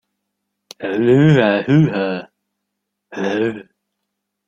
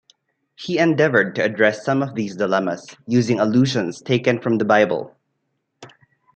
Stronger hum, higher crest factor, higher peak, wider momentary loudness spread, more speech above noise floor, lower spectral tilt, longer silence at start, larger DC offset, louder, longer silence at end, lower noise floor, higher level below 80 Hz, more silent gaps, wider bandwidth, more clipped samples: neither; about the same, 16 dB vs 18 dB; about the same, -2 dBFS vs -2 dBFS; first, 17 LU vs 9 LU; first, 62 dB vs 54 dB; first, -8 dB/octave vs -6 dB/octave; first, 0.8 s vs 0.6 s; neither; first, -16 LUFS vs -19 LUFS; first, 0.85 s vs 0.5 s; first, -77 dBFS vs -73 dBFS; first, -56 dBFS vs -66 dBFS; neither; second, 7.4 kHz vs 8.8 kHz; neither